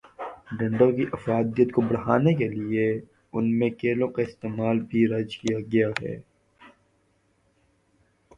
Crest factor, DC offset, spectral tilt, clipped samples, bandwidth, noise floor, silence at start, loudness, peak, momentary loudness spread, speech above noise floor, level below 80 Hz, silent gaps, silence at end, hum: 20 dB; under 0.1%; -8 dB/octave; under 0.1%; 7.8 kHz; -67 dBFS; 0.2 s; -25 LUFS; -6 dBFS; 12 LU; 43 dB; -60 dBFS; none; 1.7 s; none